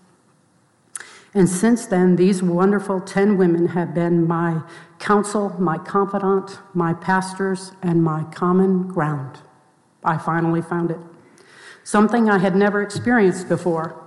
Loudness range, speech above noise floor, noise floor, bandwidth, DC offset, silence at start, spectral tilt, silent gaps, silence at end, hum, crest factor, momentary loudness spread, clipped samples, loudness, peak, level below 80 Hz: 4 LU; 40 dB; -59 dBFS; 12 kHz; under 0.1%; 0.95 s; -7 dB/octave; none; 0 s; none; 14 dB; 10 LU; under 0.1%; -19 LUFS; -6 dBFS; -58 dBFS